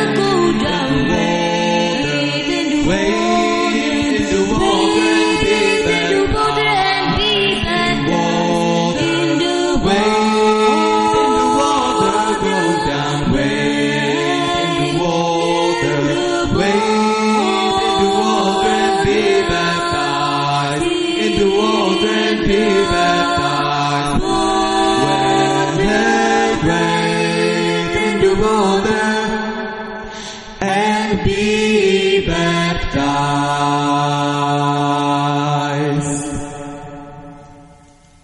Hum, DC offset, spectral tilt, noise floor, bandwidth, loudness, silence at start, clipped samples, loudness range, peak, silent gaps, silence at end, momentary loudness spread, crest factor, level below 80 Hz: none; under 0.1%; -4.5 dB/octave; -46 dBFS; 11 kHz; -15 LUFS; 0 s; under 0.1%; 3 LU; -2 dBFS; none; 0.6 s; 4 LU; 14 dB; -34 dBFS